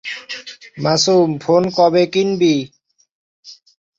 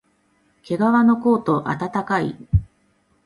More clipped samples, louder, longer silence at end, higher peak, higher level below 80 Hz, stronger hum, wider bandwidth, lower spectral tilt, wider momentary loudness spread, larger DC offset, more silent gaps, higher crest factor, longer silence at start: neither; first, -15 LUFS vs -20 LUFS; second, 0.45 s vs 0.6 s; first, 0 dBFS vs -6 dBFS; second, -60 dBFS vs -36 dBFS; neither; second, 7.8 kHz vs 11 kHz; second, -5 dB/octave vs -8.5 dB/octave; first, 16 LU vs 8 LU; neither; first, 3.11-3.43 s vs none; about the same, 16 dB vs 16 dB; second, 0.05 s vs 0.7 s